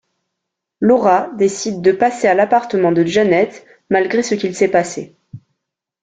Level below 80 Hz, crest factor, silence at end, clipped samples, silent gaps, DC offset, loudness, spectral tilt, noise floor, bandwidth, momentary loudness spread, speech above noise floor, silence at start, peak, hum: -58 dBFS; 14 dB; 0.65 s; under 0.1%; none; under 0.1%; -15 LUFS; -5 dB/octave; -79 dBFS; 9.4 kHz; 6 LU; 64 dB; 0.8 s; -2 dBFS; none